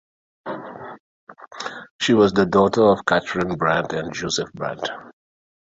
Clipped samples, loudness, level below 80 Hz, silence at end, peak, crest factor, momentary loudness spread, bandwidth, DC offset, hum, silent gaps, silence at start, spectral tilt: under 0.1%; -20 LUFS; -54 dBFS; 0.65 s; -2 dBFS; 20 dB; 21 LU; 8 kHz; under 0.1%; none; 1.00-1.27 s, 1.91-1.99 s; 0.45 s; -5 dB/octave